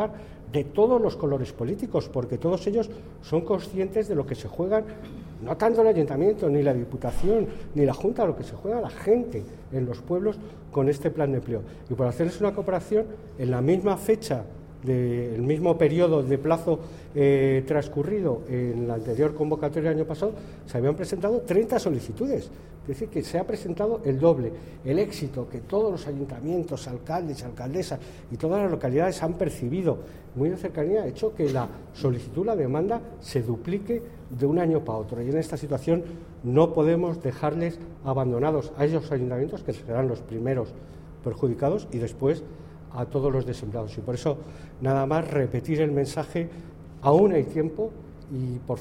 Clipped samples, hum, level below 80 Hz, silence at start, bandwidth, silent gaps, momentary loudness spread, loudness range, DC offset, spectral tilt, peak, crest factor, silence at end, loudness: under 0.1%; none; -46 dBFS; 0 s; 16 kHz; none; 12 LU; 4 LU; under 0.1%; -8 dB/octave; -8 dBFS; 18 dB; 0 s; -26 LUFS